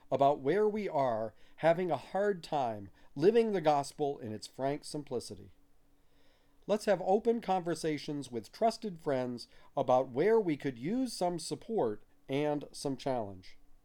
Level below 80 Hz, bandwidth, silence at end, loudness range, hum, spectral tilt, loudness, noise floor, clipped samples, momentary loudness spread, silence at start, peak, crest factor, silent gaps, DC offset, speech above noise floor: -64 dBFS; 17 kHz; 0.15 s; 4 LU; none; -5.5 dB/octave; -33 LUFS; -63 dBFS; under 0.1%; 12 LU; 0.05 s; -14 dBFS; 18 dB; none; under 0.1%; 31 dB